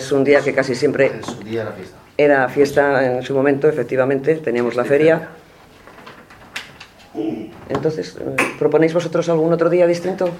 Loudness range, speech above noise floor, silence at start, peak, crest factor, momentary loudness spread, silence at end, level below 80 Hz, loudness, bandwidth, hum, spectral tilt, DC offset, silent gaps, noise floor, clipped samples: 6 LU; 28 dB; 0 s; 0 dBFS; 18 dB; 15 LU; 0 s; -56 dBFS; -17 LUFS; 15.5 kHz; none; -6 dB/octave; under 0.1%; none; -44 dBFS; under 0.1%